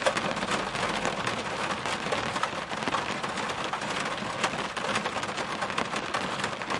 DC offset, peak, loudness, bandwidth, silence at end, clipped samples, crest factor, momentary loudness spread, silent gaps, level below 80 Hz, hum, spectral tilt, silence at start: under 0.1%; -10 dBFS; -30 LUFS; 11.5 kHz; 0 s; under 0.1%; 22 dB; 3 LU; none; -58 dBFS; none; -3 dB/octave; 0 s